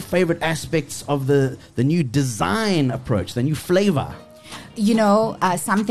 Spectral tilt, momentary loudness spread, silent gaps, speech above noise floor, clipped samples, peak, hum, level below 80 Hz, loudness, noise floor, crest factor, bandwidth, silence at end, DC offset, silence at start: -6 dB/octave; 7 LU; none; 20 dB; under 0.1%; -6 dBFS; none; -48 dBFS; -20 LUFS; -39 dBFS; 14 dB; 13 kHz; 0 s; 0.5%; 0 s